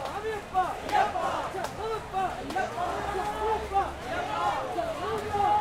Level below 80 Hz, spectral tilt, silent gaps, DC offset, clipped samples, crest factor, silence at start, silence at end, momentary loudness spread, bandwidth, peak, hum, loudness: -48 dBFS; -4.5 dB/octave; none; under 0.1%; under 0.1%; 18 dB; 0 s; 0 s; 6 LU; 16 kHz; -12 dBFS; none; -30 LUFS